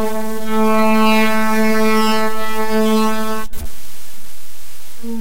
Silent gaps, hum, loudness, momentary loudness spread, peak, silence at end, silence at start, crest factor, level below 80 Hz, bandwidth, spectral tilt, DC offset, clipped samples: none; none; -16 LUFS; 24 LU; -6 dBFS; 0 s; 0 s; 14 dB; -40 dBFS; 16 kHz; -4.5 dB/octave; 20%; under 0.1%